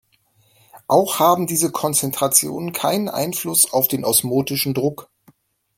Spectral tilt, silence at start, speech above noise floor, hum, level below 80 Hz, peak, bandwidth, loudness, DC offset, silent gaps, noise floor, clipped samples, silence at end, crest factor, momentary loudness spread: -3.5 dB/octave; 0.75 s; 41 dB; none; -62 dBFS; 0 dBFS; 17 kHz; -18 LUFS; under 0.1%; none; -60 dBFS; under 0.1%; 0.75 s; 20 dB; 7 LU